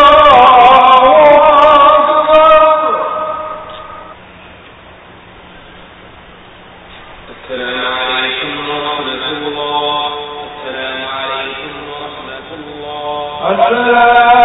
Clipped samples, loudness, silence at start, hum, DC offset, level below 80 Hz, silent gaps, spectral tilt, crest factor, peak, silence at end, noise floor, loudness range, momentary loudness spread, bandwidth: 0.3%; -9 LUFS; 0 s; none; under 0.1%; -42 dBFS; none; -5 dB/octave; 10 dB; 0 dBFS; 0 s; -36 dBFS; 18 LU; 21 LU; 8 kHz